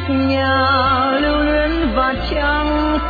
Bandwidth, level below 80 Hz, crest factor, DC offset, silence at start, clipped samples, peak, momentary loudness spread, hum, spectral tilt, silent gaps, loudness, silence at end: 4.9 kHz; -26 dBFS; 14 dB; under 0.1%; 0 s; under 0.1%; -2 dBFS; 4 LU; none; -8 dB/octave; none; -16 LUFS; 0 s